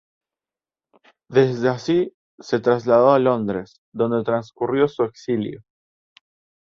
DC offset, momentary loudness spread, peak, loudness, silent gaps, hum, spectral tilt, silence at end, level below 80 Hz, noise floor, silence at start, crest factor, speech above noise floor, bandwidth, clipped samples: under 0.1%; 11 LU; -4 dBFS; -20 LUFS; 2.14-2.38 s, 3.78-3.92 s; none; -7.5 dB/octave; 1.1 s; -60 dBFS; under -90 dBFS; 1.3 s; 18 dB; over 70 dB; 7.2 kHz; under 0.1%